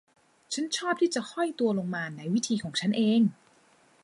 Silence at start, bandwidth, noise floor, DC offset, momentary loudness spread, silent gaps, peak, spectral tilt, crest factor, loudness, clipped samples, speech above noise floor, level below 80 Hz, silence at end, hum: 0.5 s; 11.5 kHz; -62 dBFS; under 0.1%; 9 LU; none; -14 dBFS; -4.5 dB/octave; 14 dB; -28 LUFS; under 0.1%; 34 dB; -76 dBFS; 0.7 s; none